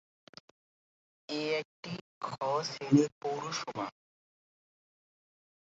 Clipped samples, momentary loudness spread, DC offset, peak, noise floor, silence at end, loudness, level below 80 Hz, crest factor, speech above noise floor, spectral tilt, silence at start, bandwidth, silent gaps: under 0.1%; 15 LU; under 0.1%; -12 dBFS; under -90 dBFS; 1.75 s; -34 LUFS; -78 dBFS; 24 dB; over 58 dB; -5 dB/octave; 1.3 s; 7.6 kHz; 1.65-1.83 s, 2.01-2.21 s, 3.12-3.21 s